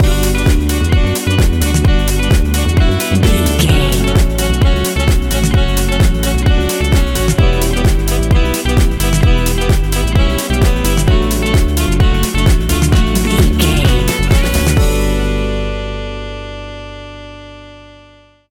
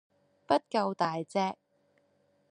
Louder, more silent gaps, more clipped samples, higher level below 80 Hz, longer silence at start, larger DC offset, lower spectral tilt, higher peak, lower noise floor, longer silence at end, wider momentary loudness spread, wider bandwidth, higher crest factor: first, -13 LUFS vs -31 LUFS; neither; neither; first, -14 dBFS vs -78 dBFS; second, 0 s vs 0.5 s; neither; about the same, -5 dB/octave vs -5.5 dB/octave; first, 0 dBFS vs -12 dBFS; second, -44 dBFS vs -71 dBFS; second, 0.7 s vs 0.95 s; first, 9 LU vs 6 LU; first, 17 kHz vs 10 kHz; second, 12 dB vs 22 dB